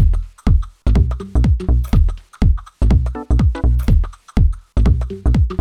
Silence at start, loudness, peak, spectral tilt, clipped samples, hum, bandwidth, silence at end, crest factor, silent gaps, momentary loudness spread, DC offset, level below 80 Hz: 0 s; -18 LUFS; -2 dBFS; -8.5 dB/octave; under 0.1%; none; 8.8 kHz; 0 s; 12 dB; none; 3 LU; 0.5%; -16 dBFS